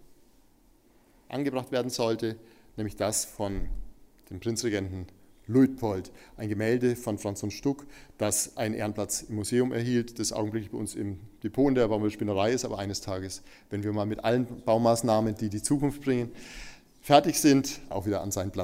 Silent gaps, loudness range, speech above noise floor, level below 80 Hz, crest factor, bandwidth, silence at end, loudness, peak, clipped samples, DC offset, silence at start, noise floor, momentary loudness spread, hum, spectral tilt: none; 5 LU; 33 dB; -48 dBFS; 24 dB; 16 kHz; 0 s; -28 LUFS; -4 dBFS; under 0.1%; under 0.1%; 0.1 s; -61 dBFS; 15 LU; none; -5 dB/octave